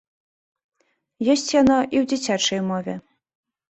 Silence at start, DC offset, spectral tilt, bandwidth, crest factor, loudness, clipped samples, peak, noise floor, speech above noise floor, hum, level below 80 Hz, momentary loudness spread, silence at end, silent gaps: 1.2 s; under 0.1%; -4 dB/octave; 8.2 kHz; 18 dB; -20 LUFS; under 0.1%; -6 dBFS; -53 dBFS; 33 dB; none; -56 dBFS; 11 LU; 0.75 s; none